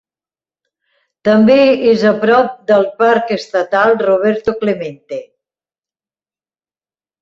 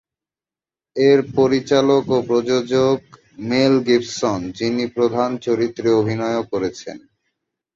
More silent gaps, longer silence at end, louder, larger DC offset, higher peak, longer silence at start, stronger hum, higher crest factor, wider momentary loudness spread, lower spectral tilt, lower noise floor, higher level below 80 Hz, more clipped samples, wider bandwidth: neither; first, 2 s vs 0.8 s; first, -12 LUFS vs -18 LUFS; neither; about the same, -2 dBFS vs -2 dBFS; first, 1.25 s vs 0.95 s; neither; about the same, 14 dB vs 16 dB; first, 12 LU vs 9 LU; about the same, -6.5 dB/octave vs -6 dB/octave; about the same, under -90 dBFS vs under -90 dBFS; about the same, -54 dBFS vs -56 dBFS; neither; about the same, 7.6 kHz vs 7.8 kHz